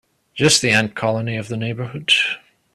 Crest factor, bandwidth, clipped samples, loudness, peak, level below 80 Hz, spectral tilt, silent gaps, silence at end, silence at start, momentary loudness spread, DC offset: 20 dB; 14 kHz; under 0.1%; -18 LUFS; 0 dBFS; -54 dBFS; -3 dB/octave; none; 0.35 s; 0.35 s; 12 LU; under 0.1%